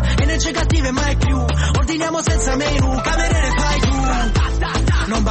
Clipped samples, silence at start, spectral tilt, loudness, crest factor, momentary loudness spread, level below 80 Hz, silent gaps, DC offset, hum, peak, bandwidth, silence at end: under 0.1%; 0 s; -4.5 dB/octave; -18 LUFS; 10 dB; 2 LU; -20 dBFS; none; under 0.1%; none; -6 dBFS; 8.8 kHz; 0 s